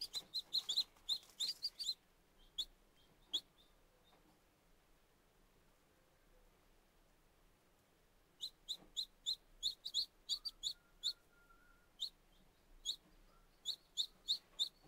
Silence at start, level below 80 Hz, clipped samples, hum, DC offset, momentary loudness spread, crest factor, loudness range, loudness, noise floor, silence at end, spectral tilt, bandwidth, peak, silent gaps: 0 s; -74 dBFS; under 0.1%; none; under 0.1%; 9 LU; 22 dB; 10 LU; -43 LUFS; -73 dBFS; 0 s; 1 dB/octave; 16 kHz; -26 dBFS; none